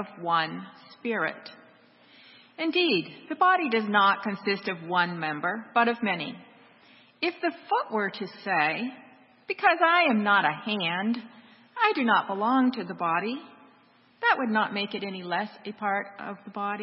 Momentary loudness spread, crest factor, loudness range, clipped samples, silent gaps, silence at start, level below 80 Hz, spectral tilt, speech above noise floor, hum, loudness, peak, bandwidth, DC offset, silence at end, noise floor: 15 LU; 20 dB; 5 LU; under 0.1%; none; 0 s; -82 dBFS; -9 dB/octave; 33 dB; none; -26 LUFS; -6 dBFS; 5.8 kHz; under 0.1%; 0 s; -60 dBFS